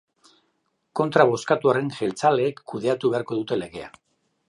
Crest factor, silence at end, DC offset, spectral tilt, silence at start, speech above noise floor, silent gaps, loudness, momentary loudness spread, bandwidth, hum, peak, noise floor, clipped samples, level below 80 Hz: 22 dB; 0.6 s; under 0.1%; -6 dB/octave; 0.95 s; 50 dB; none; -23 LUFS; 12 LU; 11.5 kHz; none; -2 dBFS; -72 dBFS; under 0.1%; -66 dBFS